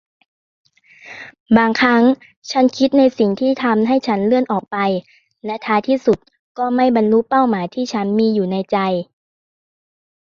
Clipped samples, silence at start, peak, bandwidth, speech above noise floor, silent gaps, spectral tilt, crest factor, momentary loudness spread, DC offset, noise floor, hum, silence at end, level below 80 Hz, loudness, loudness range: under 0.1%; 1.05 s; -2 dBFS; 7.2 kHz; 25 dB; 1.40-1.46 s, 2.36-2.42 s, 6.39-6.55 s; -6.5 dB/octave; 16 dB; 12 LU; under 0.1%; -41 dBFS; none; 1.2 s; -56 dBFS; -16 LUFS; 3 LU